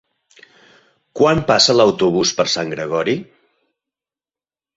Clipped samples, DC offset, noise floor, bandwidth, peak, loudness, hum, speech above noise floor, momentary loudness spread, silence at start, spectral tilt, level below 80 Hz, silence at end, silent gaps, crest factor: under 0.1%; under 0.1%; under -90 dBFS; 8 kHz; -2 dBFS; -16 LUFS; none; over 75 dB; 10 LU; 1.15 s; -3.5 dB/octave; -50 dBFS; 1.55 s; none; 18 dB